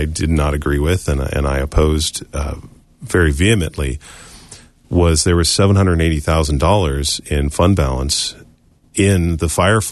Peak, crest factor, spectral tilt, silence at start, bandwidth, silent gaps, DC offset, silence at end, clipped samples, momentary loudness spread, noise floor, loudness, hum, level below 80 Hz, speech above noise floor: -2 dBFS; 14 dB; -5 dB/octave; 0 s; 12.5 kHz; none; under 0.1%; 0 s; under 0.1%; 11 LU; -50 dBFS; -16 LUFS; none; -24 dBFS; 35 dB